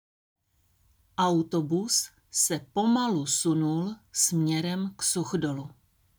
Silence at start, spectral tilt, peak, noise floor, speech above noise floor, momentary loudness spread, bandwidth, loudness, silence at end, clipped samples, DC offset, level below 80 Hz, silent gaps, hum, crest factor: 1.2 s; -4 dB/octave; -10 dBFS; -68 dBFS; 41 dB; 7 LU; over 20 kHz; -27 LUFS; 0.5 s; under 0.1%; under 0.1%; -66 dBFS; none; none; 18 dB